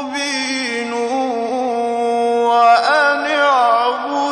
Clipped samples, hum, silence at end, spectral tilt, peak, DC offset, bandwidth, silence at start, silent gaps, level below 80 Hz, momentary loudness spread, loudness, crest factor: under 0.1%; none; 0 s; -2 dB/octave; -2 dBFS; under 0.1%; 10.5 kHz; 0 s; none; -70 dBFS; 8 LU; -15 LUFS; 14 dB